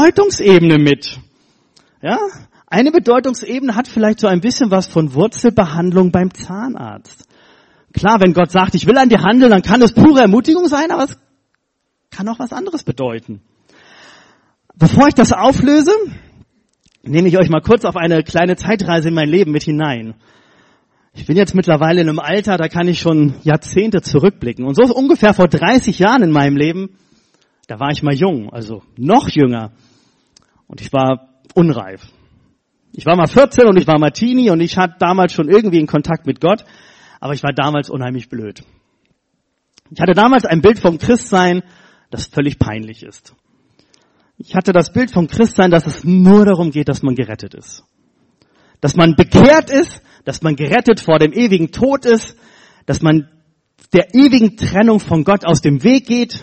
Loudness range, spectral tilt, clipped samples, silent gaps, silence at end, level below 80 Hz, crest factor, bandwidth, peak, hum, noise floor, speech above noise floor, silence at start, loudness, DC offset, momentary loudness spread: 7 LU; -6.5 dB/octave; under 0.1%; none; 0.05 s; -40 dBFS; 14 dB; 8.8 kHz; 0 dBFS; none; -69 dBFS; 57 dB; 0 s; -12 LUFS; under 0.1%; 14 LU